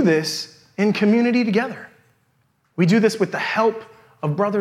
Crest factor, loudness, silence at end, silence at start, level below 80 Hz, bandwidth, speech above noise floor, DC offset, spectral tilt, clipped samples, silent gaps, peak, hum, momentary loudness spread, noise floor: 16 dB; -20 LUFS; 0 s; 0 s; -72 dBFS; 14 kHz; 46 dB; under 0.1%; -6 dB/octave; under 0.1%; none; -4 dBFS; none; 14 LU; -64 dBFS